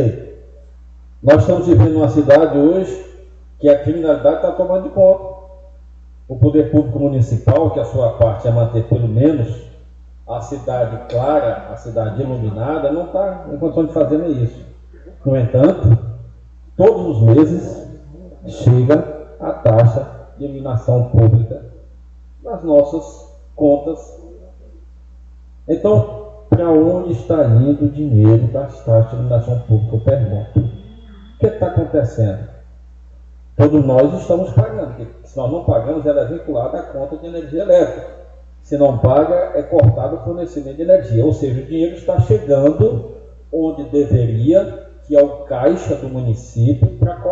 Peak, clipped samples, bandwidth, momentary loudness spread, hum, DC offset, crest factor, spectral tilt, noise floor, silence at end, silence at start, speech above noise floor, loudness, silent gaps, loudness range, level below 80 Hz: 0 dBFS; under 0.1%; 7.4 kHz; 15 LU; none; under 0.1%; 16 dB; -10 dB/octave; -39 dBFS; 0 s; 0 s; 25 dB; -15 LUFS; none; 6 LU; -36 dBFS